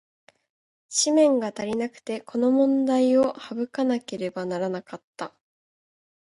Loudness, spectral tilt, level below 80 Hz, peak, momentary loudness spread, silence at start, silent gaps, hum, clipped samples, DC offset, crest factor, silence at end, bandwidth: -24 LUFS; -4 dB/octave; -72 dBFS; -8 dBFS; 16 LU; 0.9 s; 5.04-5.13 s; none; under 0.1%; under 0.1%; 16 dB; 1 s; 11.5 kHz